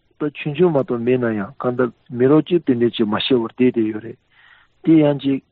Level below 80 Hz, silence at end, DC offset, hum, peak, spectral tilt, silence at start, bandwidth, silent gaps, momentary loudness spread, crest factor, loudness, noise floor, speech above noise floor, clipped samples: -58 dBFS; 0.15 s; under 0.1%; none; -4 dBFS; -6 dB/octave; 0.2 s; 4.6 kHz; none; 10 LU; 14 dB; -18 LUFS; -52 dBFS; 34 dB; under 0.1%